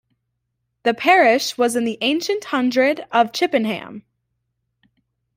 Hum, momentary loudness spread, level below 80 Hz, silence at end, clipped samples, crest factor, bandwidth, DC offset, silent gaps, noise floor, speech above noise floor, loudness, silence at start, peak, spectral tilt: none; 10 LU; -68 dBFS; 1.35 s; under 0.1%; 18 dB; 16 kHz; under 0.1%; none; -75 dBFS; 57 dB; -18 LUFS; 0.85 s; -2 dBFS; -3 dB/octave